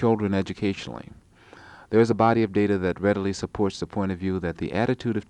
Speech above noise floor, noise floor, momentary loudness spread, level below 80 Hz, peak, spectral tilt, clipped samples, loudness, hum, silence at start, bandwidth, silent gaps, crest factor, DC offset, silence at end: 25 dB; -49 dBFS; 8 LU; -52 dBFS; -6 dBFS; -7 dB/octave; under 0.1%; -25 LUFS; none; 0 s; 10 kHz; none; 18 dB; under 0.1%; 0.05 s